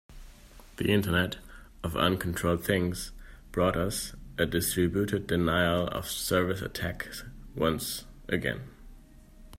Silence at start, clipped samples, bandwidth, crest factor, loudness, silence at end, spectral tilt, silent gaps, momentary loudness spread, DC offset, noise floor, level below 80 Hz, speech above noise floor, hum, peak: 0.1 s; under 0.1%; 16 kHz; 20 dB; -29 LUFS; 0.05 s; -4.5 dB/octave; none; 13 LU; under 0.1%; -52 dBFS; -48 dBFS; 23 dB; none; -10 dBFS